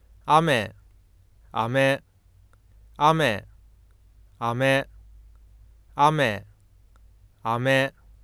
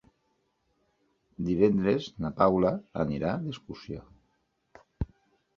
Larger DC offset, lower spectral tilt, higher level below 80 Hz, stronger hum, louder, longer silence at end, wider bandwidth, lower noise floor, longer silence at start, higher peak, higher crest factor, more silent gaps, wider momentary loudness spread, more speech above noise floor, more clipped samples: neither; second, -5.5 dB/octave vs -8.5 dB/octave; about the same, -54 dBFS vs -50 dBFS; neither; first, -23 LUFS vs -28 LUFS; second, 0.35 s vs 0.55 s; first, 15 kHz vs 7 kHz; second, -56 dBFS vs -74 dBFS; second, 0.25 s vs 1.4 s; first, -4 dBFS vs -8 dBFS; about the same, 22 dB vs 24 dB; neither; second, 14 LU vs 17 LU; second, 34 dB vs 47 dB; neither